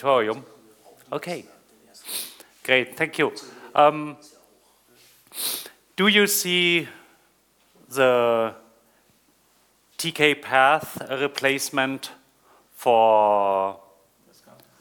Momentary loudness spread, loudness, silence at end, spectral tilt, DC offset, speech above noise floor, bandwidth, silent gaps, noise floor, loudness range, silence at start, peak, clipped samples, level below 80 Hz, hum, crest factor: 17 LU; -22 LUFS; 1.05 s; -3 dB/octave; under 0.1%; 41 dB; 19.5 kHz; none; -62 dBFS; 5 LU; 0 s; -2 dBFS; under 0.1%; -72 dBFS; none; 22 dB